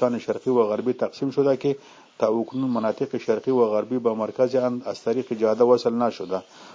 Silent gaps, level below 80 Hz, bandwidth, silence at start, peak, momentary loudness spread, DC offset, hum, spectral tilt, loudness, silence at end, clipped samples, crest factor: none; -70 dBFS; 7.6 kHz; 0 s; -6 dBFS; 7 LU; under 0.1%; none; -7 dB/octave; -24 LUFS; 0 s; under 0.1%; 16 dB